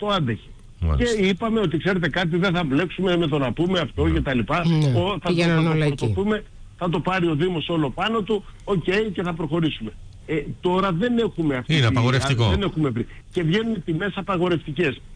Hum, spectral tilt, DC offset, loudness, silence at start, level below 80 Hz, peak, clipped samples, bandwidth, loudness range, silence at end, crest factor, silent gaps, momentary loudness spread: none; -6.5 dB/octave; under 0.1%; -22 LUFS; 0 s; -38 dBFS; -10 dBFS; under 0.1%; 10.5 kHz; 3 LU; 0 s; 12 dB; none; 7 LU